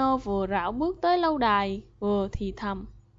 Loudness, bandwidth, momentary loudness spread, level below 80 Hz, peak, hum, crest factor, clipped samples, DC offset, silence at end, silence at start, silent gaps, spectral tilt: -27 LUFS; 7.6 kHz; 9 LU; -44 dBFS; -10 dBFS; 50 Hz at -45 dBFS; 16 dB; under 0.1%; under 0.1%; 0.2 s; 0 s; none; -7 dB/octave